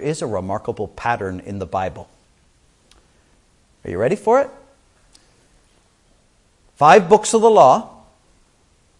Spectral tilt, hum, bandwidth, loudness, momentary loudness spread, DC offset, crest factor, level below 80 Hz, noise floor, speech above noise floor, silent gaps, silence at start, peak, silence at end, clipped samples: -5 dB/octave; none; 11.5 kHz; -17 LUFS; 17 LU; under 0.1%; 20 dB; -54 dBFS; -58 dBFS; 42 dB; none; 0 s; 0 dBFS; 1.1 s; under 0.1%